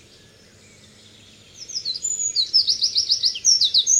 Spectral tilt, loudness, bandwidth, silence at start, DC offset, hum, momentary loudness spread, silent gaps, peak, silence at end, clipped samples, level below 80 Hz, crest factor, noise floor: 3 dB/octave; -18 LUFS; 16 kHz; 1.55 s; under 0.1%; none; 12 LU; none; -6 dBFS; 0 s; under 0.1%; -64 dBFS; 18 dB; -50 dBFS